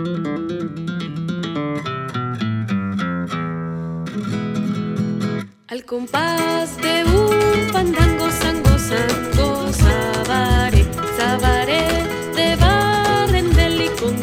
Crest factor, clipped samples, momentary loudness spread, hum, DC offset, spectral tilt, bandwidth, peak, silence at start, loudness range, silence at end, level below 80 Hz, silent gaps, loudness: 18 dB; under 0.1%; 10 LU; none; under 0.1%; -5.5 dB/octave; 16.5 kHz; 0 dBFS; 0 s; 7 LU; 0 s; -24 dBFS; none; -19 LUFS